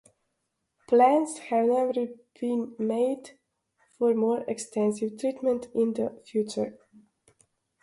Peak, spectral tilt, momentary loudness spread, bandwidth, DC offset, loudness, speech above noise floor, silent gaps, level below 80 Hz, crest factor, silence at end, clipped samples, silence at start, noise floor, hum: -8 dBFS; -5.5 dB/octave; 10 LU; 11.5 kHz; under 0.1%; -27 LUFS; 53 dB; none; -74 dBFS; 20 dB; 1.1 s; under 0.1%; 0.9 s; -80 dBFS; none